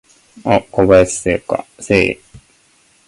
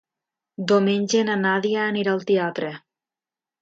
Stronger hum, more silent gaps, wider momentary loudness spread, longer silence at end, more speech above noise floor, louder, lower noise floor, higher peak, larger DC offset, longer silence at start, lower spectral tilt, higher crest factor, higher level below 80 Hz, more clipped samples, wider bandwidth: neither; neither; about the same, 12 LU vs 12 LU; second, 0.7 s vs 0.85 s; second, 39 dB vs over 69 dB; first, -15 LUFS vs -22 LUFS; second, -54 dBFS vs under -90 dBFS; first, 0 dBFS vs -8 dBFS; neither; second, 0.45 s vs 0.6 s; about the same, -5 dB/octave vs -5 dB/octave; about the same, 16 dB vs 16 dB; first, -38 dBFS vs -72 dBFS; neither; first, 11.5 kHz vs 7.8 kHz